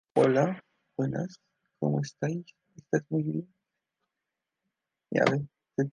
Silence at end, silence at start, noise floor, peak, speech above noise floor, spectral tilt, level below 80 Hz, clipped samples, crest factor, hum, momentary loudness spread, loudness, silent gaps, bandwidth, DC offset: 0.05 s; 0.15 s; -87 dBFS; -8 dBFS; 59 dB; -7 dB/octave; -72 dBFS; under 0.1%; 24 dB; none; 13 LU; -30 LUFS; none; 10.5 kHz; under 0.1%